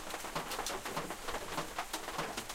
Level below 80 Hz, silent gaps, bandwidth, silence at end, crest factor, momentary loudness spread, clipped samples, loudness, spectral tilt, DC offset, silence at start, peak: -54 dBFS; none; 16.5 kHz; 0 s; 16 dB; 2 LU; under 0.1%; -40 LUFS; -2 dB/octave; under 0.1%; 0 s; -24 dBFS